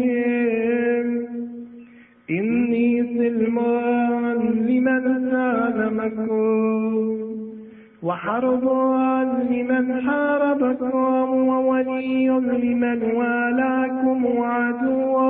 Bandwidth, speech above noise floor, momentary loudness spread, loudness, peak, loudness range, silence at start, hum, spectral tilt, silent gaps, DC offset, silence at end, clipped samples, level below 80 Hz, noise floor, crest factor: 3.7 kHz; 27 dB; 7 LU; -21 LUFS; -8 dBFS; 2 LU; 0 s; none; -11.5 dB/octave; none; under 0.1%; 0 s; under 0.1%; -62 dBFS; -46 dBFS; 12 dB